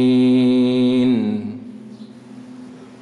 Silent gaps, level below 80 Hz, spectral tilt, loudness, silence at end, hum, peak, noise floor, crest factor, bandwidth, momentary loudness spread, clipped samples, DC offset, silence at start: none; -62 dBFS; -7.5 dB/octave; -16 LUFS; 0.05 s; none; -8 dBFS; -38 dBFS; 10 dB; 9.8 kHz; 24 LU; under 0.1%; under 0.1%; 0 s